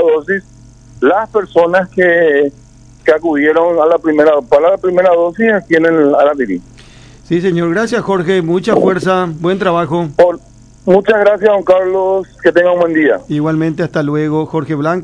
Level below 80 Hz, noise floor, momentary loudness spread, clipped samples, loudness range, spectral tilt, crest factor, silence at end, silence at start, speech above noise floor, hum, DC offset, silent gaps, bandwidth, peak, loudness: -46 dBFS; -38 dBFS; 6 LU; 0.4%; 3 LU; -7 dB/octave; 12 dB; 0 s; 0 s; 27 dB; none; under 0.1%; none; 10.5 kHz; 0 dBFS; -12 LUFS